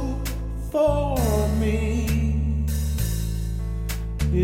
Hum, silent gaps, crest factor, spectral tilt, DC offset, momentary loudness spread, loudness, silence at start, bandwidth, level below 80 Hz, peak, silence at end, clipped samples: none; none; 14 dB; -6.5 dB/octave; under 0.1%; 8 LU; -25 LUFS; 0 s; 17 kHz; -26 dBFS; -8 dBFS; 0 s; under 0.1%